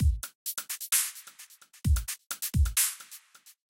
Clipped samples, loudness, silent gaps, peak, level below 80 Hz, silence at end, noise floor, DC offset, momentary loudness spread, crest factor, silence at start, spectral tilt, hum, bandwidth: under 0.1%; -29 LUFS; 0.35-0.46 s, 2.26-2.30 s; -12 dBFS; -34 dBFS; 0.2 s; -53 dBFS; under 0.1%; 22 LU; 18 dB; 0 s; -2.5 dB/octave; none; 17 kHz